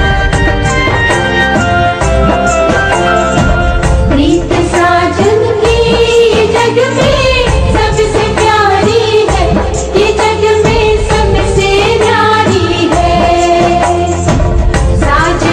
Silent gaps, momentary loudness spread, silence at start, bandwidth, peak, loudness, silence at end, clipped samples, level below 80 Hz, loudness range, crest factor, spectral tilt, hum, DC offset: none; 3 LU; 0 s; 10.5 kHz; 0 dBFS; -9 LUFS; 0 s; 0.1%; -16 dBFS; 1 LU; 8 dB; -5 dB/octave; none; under 0.1%